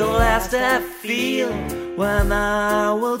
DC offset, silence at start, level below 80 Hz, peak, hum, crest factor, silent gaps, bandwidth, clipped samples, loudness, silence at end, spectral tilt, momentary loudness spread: under 0.1%; 0 s; -30 dBFS; -4 dBFS; none; 16 dB; none; 16 kHz; under 0.1%; -20 LUFS; 0 s; -4.5 dB/octave; 6 LU